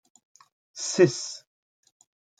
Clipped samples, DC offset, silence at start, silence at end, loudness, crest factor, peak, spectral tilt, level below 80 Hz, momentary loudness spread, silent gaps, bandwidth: under 0.1%; under 0.1%; 0.75 s; 1 s; -25 LUFS; 24 dB; -6 dBFS; -4.5 dB/octave; -78 dBFS; 21 LU; none; 9.4 kHz